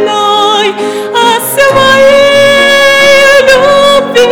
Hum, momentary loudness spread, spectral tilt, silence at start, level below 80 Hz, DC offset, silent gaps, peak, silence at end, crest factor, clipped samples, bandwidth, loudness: none; 6 LU; -2 dB/octave; 0 s; -38 dBFS; under 0.1%; none; 0 dBFS; 0 s; 6 dB; 6%; over 20 kHz; -5 LUFS